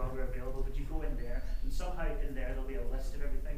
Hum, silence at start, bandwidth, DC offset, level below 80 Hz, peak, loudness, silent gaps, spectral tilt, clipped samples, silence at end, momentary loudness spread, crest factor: none; 0 s; 14.5 kHz; under 0.1%; -34 dBFS; -22 dBFS; -41 LUFS; none; -6.5 dB/octave; under 0.1%; 0 s; 3 LU; 10 dB